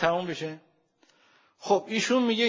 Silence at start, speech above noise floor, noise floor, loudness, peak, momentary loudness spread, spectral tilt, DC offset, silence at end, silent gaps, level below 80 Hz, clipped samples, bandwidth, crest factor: 0 s; 40 dB; -66 dBFS; -27 LUFS; -8 dBFS; 17 LU; -4 dB/octave; under 0.1%; 0 s; none; -72 dBFS; under 0.1%; 7.6 kHz; 20 dB